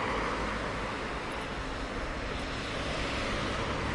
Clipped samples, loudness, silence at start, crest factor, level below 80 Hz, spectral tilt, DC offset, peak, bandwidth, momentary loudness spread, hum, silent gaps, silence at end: under 0.1%; -34 LUFS; 0 s; 14 dB; -42 dBFS; -4.5 dB/octave; under 0.1%; -20 dBFS; 11.5 kHz; 4 LU; none; none; 0 s